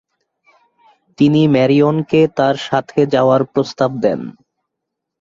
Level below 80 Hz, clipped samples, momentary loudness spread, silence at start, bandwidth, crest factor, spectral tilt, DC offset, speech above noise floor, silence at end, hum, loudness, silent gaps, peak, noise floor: -56 dBFS; under 0.1%; 7 LU; 1.2 s; 7.6 kHz; 14 dB; -7.5 dB/octave; under 0.1%; 65 dB; 0.9 s; none; -15 LUFS; none; -2 dBFS; -78 dBFS